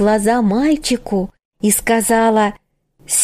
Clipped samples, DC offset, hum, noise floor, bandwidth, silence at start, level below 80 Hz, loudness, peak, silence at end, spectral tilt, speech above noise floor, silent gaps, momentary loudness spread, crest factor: under 0.1%; under 0.1%; none; -45 dBFS; 15.5 kHz; 0 s; -42 dBFS; -16 LUFS; -2 dBFS; 0 s; -4 dB/octave; 31 dB; 1.45-1.52 s; 8 LU; 14 dB